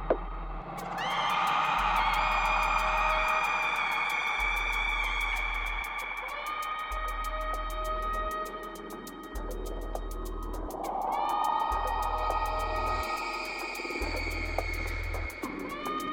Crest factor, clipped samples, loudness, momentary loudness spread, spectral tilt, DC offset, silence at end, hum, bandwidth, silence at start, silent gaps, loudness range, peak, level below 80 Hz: 18 dB; under 0.1%; -31 LUFS; 12 LU; -3.5 dB/octave; under 0.1%; 0 s; none; 18.5 kHz; 0 s; none; 9 LU; -14 dBFS; -40 dBFS